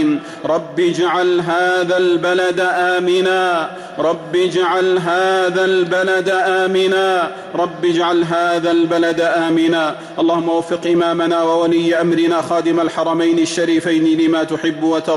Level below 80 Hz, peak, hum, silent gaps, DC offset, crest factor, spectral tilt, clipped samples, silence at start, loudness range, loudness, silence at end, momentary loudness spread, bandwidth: -60 dBFS; -6 dBFS; none; none; under 0.1%; 8 dB; -5 dB/octave; under 0.1%; 0 s; 1 LU; -16 LUFS; 0 s; 4 LU; 11.5 kHz